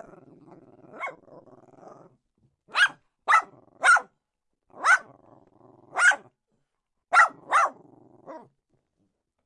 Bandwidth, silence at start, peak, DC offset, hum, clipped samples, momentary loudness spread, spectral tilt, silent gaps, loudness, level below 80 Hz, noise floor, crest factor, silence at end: 11.5 kHz; 0.95 s; -6 dBFS; under 0.1%; none; under 0.1%; 17 LU; 0.5 dB/octave; none; -22 LUFS; -78 dBFS; -81 dBFS; 22 dB; 1.05 s